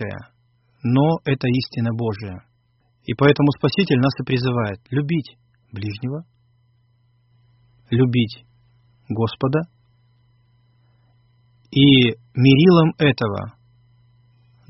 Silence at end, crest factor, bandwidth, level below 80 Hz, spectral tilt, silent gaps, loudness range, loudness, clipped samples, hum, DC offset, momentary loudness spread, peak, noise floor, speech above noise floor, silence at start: 1.2 s; 20 dB; 6 kHz; -54 dBFS; -5.5 dB/octave; none; 10 LU; -19 LUFS; under 0.1%; none; under 0.1%; 20 LU; -2 dBFS; -63 dBFS; 45 dB; 0 s